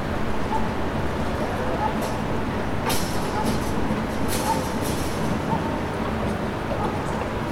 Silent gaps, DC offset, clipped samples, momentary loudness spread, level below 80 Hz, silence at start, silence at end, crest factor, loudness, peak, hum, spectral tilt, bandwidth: none; under 0.1%; under 0.1%; 2 LU; -36 dBFS; 0 s; 0 s; 14 dB; -26 LUFS; -10 dBFS; none; -5.5 dB/octave; 17 kHz